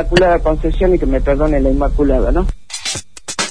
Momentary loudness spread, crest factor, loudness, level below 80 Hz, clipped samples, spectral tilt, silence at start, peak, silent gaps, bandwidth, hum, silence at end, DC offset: 10 LU; 14 dB; -16 LUFS; -18 dBFS; under 0.1%; -5 dB/octave; 0 s; 0 dBFS; none; 10.5 kHz; none; 0 s; 3%